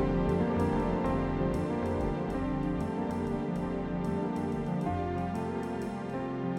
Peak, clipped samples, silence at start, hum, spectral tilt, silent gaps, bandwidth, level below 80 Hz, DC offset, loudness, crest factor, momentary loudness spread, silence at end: -18 dBFS; under 0.1%; 0 s; none; -8.5 dB/octave; none; 12 kHz; -44 dBFS; under 0.1%; -32 LUFS; 14 dB; 6 LU; 0 s